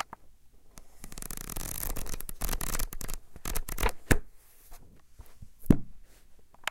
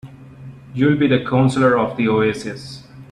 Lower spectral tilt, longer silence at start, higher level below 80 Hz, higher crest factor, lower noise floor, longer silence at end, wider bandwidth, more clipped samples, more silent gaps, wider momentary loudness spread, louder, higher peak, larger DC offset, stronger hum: second, -4.5 dB/octave vs -7 dB/octave; about the same, 0 s vs 0.05 s; first, -36 dBFS vs -50 dBFS; first, 28 dB vs 16 dB; first, -52 dBFS vs -38 dBFS; about the same, 0 s vs 0.1 s; first, 17 kHz vs 10.5 kHz; neither; neither; first, 26 LU vs 18 LU; second, -34 LUFS vs -17 LUFS; about the same, -4 dBFS vs -2 dBFS; neither; neither